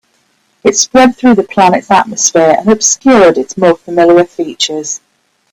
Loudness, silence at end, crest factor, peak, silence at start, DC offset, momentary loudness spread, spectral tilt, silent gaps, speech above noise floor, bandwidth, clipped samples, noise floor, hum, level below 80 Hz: -9 LUFS; 0.55 s; 10 dB; 0 dBFS; 0.65 s; under 0.1%; 8 LU; -3 dB/octave; none; 47 dB; 19.5 kHz; 0.1%; -56 dBFS; none; -46 dBFS